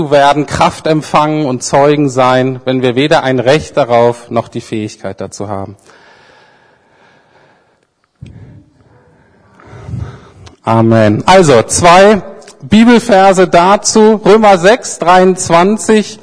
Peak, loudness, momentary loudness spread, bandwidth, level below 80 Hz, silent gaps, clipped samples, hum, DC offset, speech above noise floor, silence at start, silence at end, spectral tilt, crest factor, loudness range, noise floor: 0 dBFS; -8 LUFS; 15 LU; 11 kHz; -40 dBFS; none; 2%; none; under 0.1%; 48 dB; 0 s; 0.05 s; -5 dB/octave; 10 dB; 18 LU; -57 dBFS